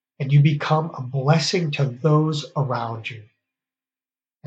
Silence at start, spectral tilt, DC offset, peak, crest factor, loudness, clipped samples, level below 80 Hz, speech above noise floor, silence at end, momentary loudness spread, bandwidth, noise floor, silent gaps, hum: 0.2 s; -6.5 dB/octave; under 0.1%; -4 dBFS; 18 dB; -21 LUFS; under 0.1%; -72 dBFS; over 70 dB; 1.2 s; 10 LU; 8.2 kHz; under -90 dBFS; none; none